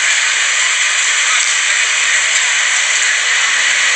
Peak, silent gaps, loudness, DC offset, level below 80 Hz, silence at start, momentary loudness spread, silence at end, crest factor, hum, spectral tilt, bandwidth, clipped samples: -2 dBFS; none; -11 LUFS; under 0.1%; -76 dBFS; 0 s; 1 LU; 0 s; 12 dB; none; 5 dB/octave; 10.5 kHz; under 0.1%